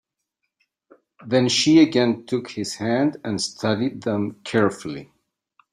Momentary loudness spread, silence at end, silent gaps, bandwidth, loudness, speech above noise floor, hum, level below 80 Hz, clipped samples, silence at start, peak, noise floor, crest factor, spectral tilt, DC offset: 12 LU; 0.7 s; none; 11.5 kHz; -21 LUFS; 58 dB; none; -64 dBFS; under 0.1%; 1.2 s; -4 dBFS; -79 dBFS; 18 dB; -4.5 dB/octave; under 0.1%